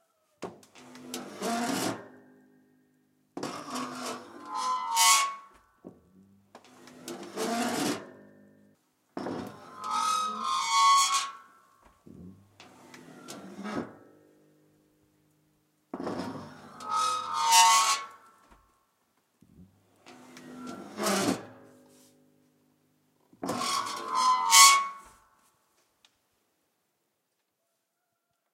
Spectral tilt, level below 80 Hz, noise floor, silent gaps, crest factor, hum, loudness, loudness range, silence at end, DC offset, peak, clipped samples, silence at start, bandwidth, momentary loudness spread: -0.5 dB/octave; -76 dBFS; -80 dBFS; none; 30 dB; none; -26 LUFS; 18 LU; 3.5 s; under 0.1%; -2 dBFS; under 0.1%; 0.4 s; 16 kHz; 25 LU